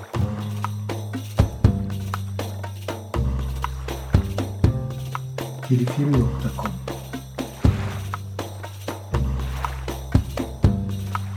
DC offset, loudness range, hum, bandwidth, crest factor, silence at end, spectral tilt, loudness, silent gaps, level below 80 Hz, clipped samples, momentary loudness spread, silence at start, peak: under 0.1%; 3 LU; none; 18 kHz; 22 dB; 0 s; -7 dB/octave; -26 LUFS; none; -32 dBFS; under 0.1%; 11 LU; 0 s; -2 dBFS